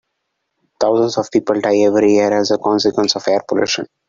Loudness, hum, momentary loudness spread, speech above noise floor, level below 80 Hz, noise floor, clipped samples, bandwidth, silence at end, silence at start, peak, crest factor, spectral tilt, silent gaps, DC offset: -15 LUFS; none; 5 LU; 58 dB; -58 dBFS; -73 dBFS; under 0.1%; 7.6 kHz; 0.25 s; 0.8 s; -2 dBFS; 14 dB; -4 dB/octave; none; under 0.1%